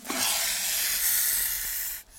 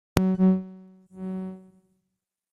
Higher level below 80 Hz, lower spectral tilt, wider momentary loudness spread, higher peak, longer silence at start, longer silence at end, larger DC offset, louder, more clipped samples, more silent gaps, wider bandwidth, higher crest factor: about the same, -54 dBFS vs -50 dBFS; second, 1.5 dB/octave vs -8 dB/octave; second, 6 LU vs 21 LU; second, -12 dBFS vs -2 dBFS; second, 0 s vs 0.15 s; second, 0 s vs 0.95 s; neither; about the same, -24 LUFS vs -25 LUFS; neither; neither; first, 17 kHz vs 13 kHz; second, 16 dB vs 26 dB